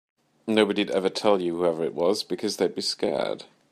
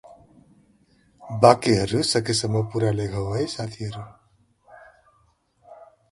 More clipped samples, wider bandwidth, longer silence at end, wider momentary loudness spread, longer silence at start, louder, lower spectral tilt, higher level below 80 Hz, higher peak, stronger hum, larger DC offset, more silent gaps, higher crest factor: neither; first, 15 kHz vs 11.5 kHz; about the same, 0.25 s vs 0.3 s; second, 6 LU vs 17 LU; second, 0.45 s vs 1.2 s; second, -25 LUFS vs -22 LUFS; about the same, -4.5 dB/octave vs -5 dB/octave; second, -68 dBFS vs -50 dBFS; second, -4 dBFS vs 0 dBFS; neither; neither; neither; about the same, 20 dB vs 24 dB